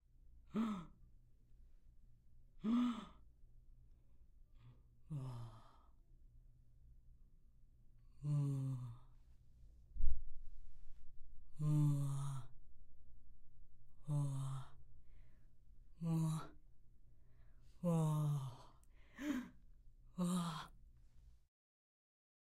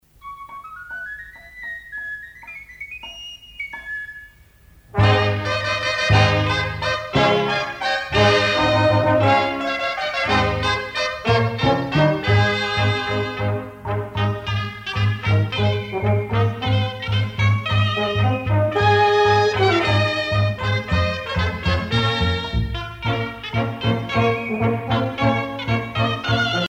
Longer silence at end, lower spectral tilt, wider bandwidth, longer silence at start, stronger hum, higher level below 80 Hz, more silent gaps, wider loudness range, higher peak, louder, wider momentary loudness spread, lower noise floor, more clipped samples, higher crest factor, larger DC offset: first, 1.15 s vs 0 s; first, -7.5 dB/octave vs -6 dB/octave; first, 12 kHz vs 8.8 kHz; about the same, 0.3 s vs 0.25 s; neither; second, -52 dBFS vs -38 dBFS; neither; first, 14 LU vs 7 LU; second, -18 dBFS vs -4 dBFS; second, -43 LUFS vs -20 LUFS; first, 22 LU vs 15 LU; first, -64 dBFS vs -50 dBFS; neither; first, 24 dB vs 16 dB; neither